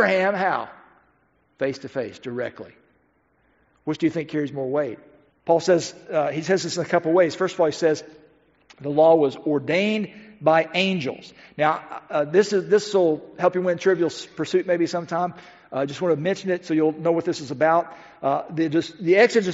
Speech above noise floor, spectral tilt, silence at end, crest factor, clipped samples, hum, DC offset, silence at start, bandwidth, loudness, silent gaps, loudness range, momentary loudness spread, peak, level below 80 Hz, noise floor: 42 dB; -4 dB/octave; 0 s; 20 dB; under 0.1%; none; under 0.1%; 0 s; 8 kHz; -22 LUFS; none; 8 LU; 12 LU; -4 dBFS; -68 dBFS; -64 dBFS